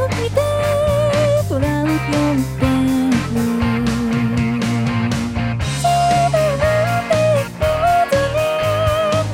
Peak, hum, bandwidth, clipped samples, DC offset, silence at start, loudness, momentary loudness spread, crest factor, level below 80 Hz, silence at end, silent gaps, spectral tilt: -4 dBFS; none; 16.5 kHz; under 0.1%; under 0.1%; 0 s; -17 LUFS; 4 LU; 14 dB; -34 dBFS; 0 s; none; -6 dB/octave